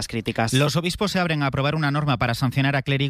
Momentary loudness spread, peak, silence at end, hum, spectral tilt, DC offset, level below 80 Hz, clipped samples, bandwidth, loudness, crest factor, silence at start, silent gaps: 3 LU; -6 dBFS; 0 s; none; -5.5 dB/octave; under 0.1%; -46 dBFS; under 0.1%; 15 kHz; -22 LUFS; 16 dB; 0 s; none